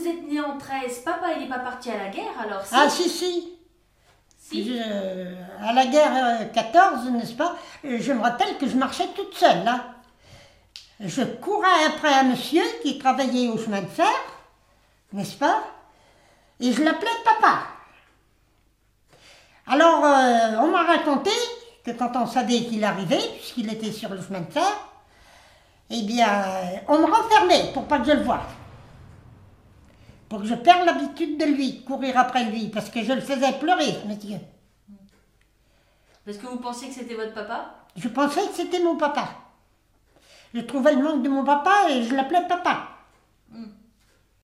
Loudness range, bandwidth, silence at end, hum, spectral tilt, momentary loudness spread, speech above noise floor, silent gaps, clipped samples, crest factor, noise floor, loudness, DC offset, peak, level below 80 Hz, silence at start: 6 LU; 15.5 kHz; 0.75 s; none; -4 dB/octave; 15 LU; 41 dB; none; under 0.1%; 22 dB; -63 dBFS; -22 LUFS; under 0.1%; -2 dBFS; -60 dBFS; 0 s